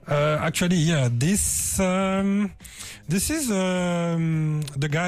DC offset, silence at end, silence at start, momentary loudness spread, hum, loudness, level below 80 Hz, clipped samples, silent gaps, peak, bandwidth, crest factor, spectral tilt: under 0.1%; 0 s; 0.05 s; 6 LU; none; -23 LUFS; -44 dBFS; under 0.1%; none; -12 dBFS; 15.5 kHz; 12 dB; -5 dB/octave